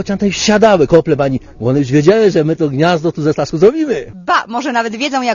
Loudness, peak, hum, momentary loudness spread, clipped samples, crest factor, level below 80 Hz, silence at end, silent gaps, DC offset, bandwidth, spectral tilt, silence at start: -13 LUFS; 0 dBFS; none; 8 LU; 0.3%; 12 dB; -42 dBFS; 0 s; none; under 0.1%; 7.4 kHz; -5.5 dB/octave; 0 s